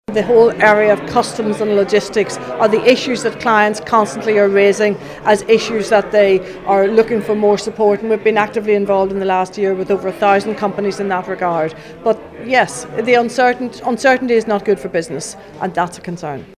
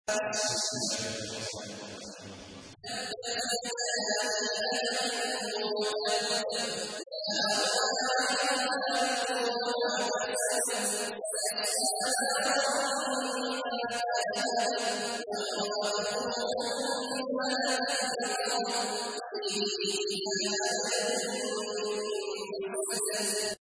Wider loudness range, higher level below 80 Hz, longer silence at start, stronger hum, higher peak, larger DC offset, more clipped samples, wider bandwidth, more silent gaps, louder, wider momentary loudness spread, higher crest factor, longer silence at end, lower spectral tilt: about the same, 4 LU vs 3 LU; first, -50 dBFS vs -74 dBFS; about the same, 0.1 s vs 0.05 s; neither; first, 0 dBFS vs -16 dBFS; neither; neither; first, 14 kHz vs 11 kHz; neither; first, -15 LUFS vs -30 LUFS; about the same, 9 LU vs 8 LU; about the same, 14 dB vs 16 dB; about the same, 0.15 s vs 0.15 s; first, -4.5 dB/octave vs -1 dB/octave